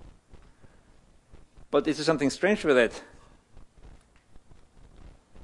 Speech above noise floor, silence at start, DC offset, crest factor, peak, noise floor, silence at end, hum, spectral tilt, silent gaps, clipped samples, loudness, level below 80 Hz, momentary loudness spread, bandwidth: 33 dB; 0.05 s; under 0.1%; 24 dB; -8 dBFS; -57 dBFS; 0 s; none; -4.5 dB/octave; none; under 0.1%; -25 LUFS; -54 dBFS; 6 LU; 11.5 kHz